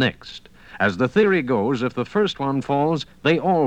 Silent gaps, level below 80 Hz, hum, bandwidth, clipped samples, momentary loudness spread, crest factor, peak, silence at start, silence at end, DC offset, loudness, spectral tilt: none; -56 dBFS; none; 9 kHz; under 0.1%; 6 LU; 16 dB; -6 dBFS; 0 s; 0 s; 0.2%; -21 LUFS; -6.5 dB/octave